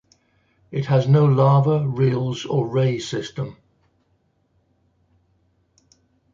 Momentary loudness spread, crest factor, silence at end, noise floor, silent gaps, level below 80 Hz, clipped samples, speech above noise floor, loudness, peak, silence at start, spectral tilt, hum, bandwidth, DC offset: 15 LU; 18 dB; 2.8 s; -66 dBFS; none; -58 dBFS; under 0.1%; 47 dB; -20 LUFS; -4 dBFS; 0.7 s; -7.5 dB/octave; none; 7.4 kHz; under 0.1%